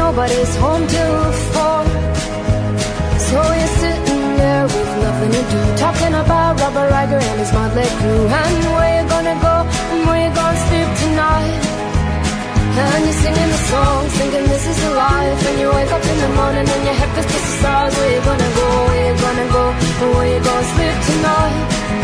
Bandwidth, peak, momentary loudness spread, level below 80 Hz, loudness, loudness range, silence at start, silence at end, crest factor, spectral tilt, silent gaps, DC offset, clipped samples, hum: 11 kHz; -2 dBFS; 3 LU; -24 dBFS; -15 LUFS; 1 LU; 0 s; 0 s; 12 dB; -5.5 dB/octave; none; under 0.1%; under 0.1%; none